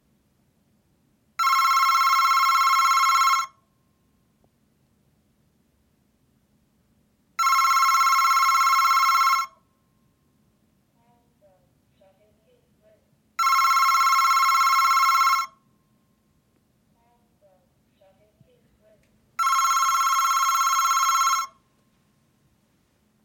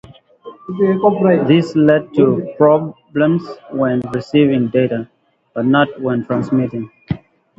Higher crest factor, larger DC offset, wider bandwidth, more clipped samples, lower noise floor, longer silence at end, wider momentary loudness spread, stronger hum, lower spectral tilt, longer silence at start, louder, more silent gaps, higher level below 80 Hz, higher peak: about the same, 16 dB vs 16 dB; neither; first, 17 kHz vs 7.8 kHz; neither; first, -66 dBFS vs -39 dBFS; first, 1.8 s vs 0.4 s; second, 7 LU vs 14 LU; neither; second, 3.5 dB/octave vs -8.5 dB/octave; first, 1.4 s vs 0.45 s; second, -19 LUFS vs -15 LUFS; neither; second, -76 dBFS vs -52 dBFS; second, -8 dBFS vs 0 dBFS